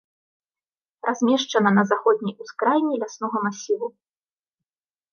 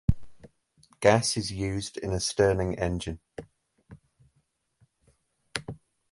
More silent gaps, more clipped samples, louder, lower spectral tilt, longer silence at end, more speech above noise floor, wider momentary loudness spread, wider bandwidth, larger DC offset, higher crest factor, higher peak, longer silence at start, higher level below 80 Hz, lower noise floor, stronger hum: neither; neither; first, -22 LUFS vs -28 LUFS; about the same, -5 dB/octave vs -4.5 dB/octave; first, 1.25 s vs 0.35 s; first, over 68 dB vs 46 dB; second, 9 LU vs 21 LU; second, 7 kHz vs 11.5 kHz; neither; second, 20 dB vs 26 dB; about the same, -4 dBFS vs -4 dBFS; first, 1.05 s vs 0.1 s; second, -76 dBFS vs -44 dBFS; first, under -90 dBFS vs -73 dBFS; neither